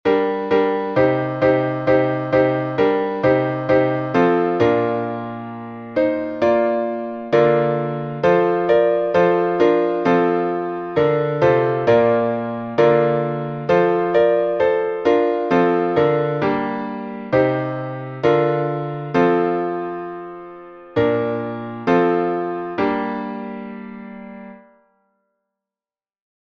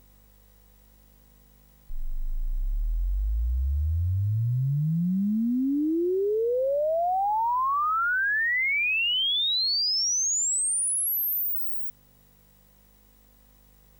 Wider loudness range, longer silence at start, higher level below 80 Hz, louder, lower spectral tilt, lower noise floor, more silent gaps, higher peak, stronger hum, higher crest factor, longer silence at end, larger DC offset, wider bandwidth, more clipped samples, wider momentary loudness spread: second, 5 LU vs 10 LU; second, 0.05 s vs 1.9 s; second, -54 dBFS vs -34 dBFS; first, -18 LUFS vs -25 LUFS; first, -8.5 dB/octave vs -3 dB/octave; first, under -90 dBFS vs -58 dBFS; neither; first, -2 dBFS vs -22 dBFS; second, none vs 50 Hz at -55 dBFS; first, 18 dB vs 6 dB; second, 1.95 s vs 2.1 s; neither; second, 6.2 kHz vs over 20 kHz; neither; about the same, 12 LU vs 10 LU